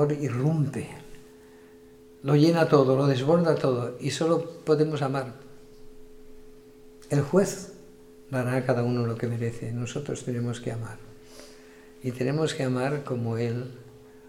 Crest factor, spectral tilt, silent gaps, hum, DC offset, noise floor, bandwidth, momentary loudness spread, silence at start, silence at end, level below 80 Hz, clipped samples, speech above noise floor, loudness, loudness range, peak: 20 dB; -7 dB/octave; none; none; under 0.1%; -51 dBFS; 15.5 kHz; 19 LU; 0 s; 0 s; -56 dBFS; under 0.1%; 25 dB; -26 LUFS; 8 LU; -6 dBFS